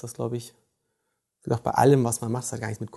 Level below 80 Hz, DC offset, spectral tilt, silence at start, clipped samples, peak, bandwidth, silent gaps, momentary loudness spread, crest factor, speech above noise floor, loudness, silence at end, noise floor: -58 dBFS; under 0.1%; -6 dB/octave; 0.05 s; under 0.1%; -6 dBFS; 12.5 kHz; none; 14 LU; 20 dB; 54 dB; -25 LUFS; 0 s; -78 dBFS